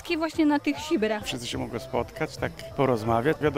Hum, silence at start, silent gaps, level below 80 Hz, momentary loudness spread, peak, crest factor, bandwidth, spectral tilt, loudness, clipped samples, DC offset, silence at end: none; 0 s; none; -52 dBFS; 8 LU; -10 dBFS; 16 dB; 16 kHz; -5.5 dB/octave; -27 LUFS; under 0.1%; 0.1%; 0 s